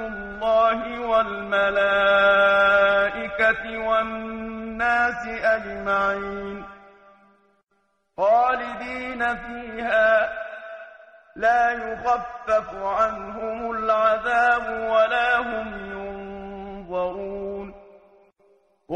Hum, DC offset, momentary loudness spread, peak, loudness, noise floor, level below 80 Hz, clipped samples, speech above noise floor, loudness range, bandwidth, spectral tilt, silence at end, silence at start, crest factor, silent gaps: none; under 0.1%; 16 LU; -8 dBFS; -22 LUFS; -70 dBFS; -50 dBFS; under 0.1%; 48 dB; 7 LU; 8.8 kHz; -4.5 dB/octave; 0 s; 0 s; 16 dB; none